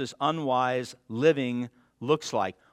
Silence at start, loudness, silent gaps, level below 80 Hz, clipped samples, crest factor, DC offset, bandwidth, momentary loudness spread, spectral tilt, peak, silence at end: 0 s; -28 LUFS; none; -74 dBFS; under 0.1%; 20 dB; under 0.1%; 12.5 kHz; 12 LU; -5.5 dB/octave; -8 dBFS; 0.2 s